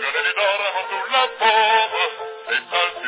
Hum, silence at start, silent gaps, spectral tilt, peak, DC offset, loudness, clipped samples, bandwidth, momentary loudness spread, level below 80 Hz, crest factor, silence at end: none; 0 s; none; -3.5 dB/octave; -2 dBFS; under 0.1%; -19 LUFS; under 0.1%; 4 kHz; 8 LU; -74 dBFS; 18 dB; 0 s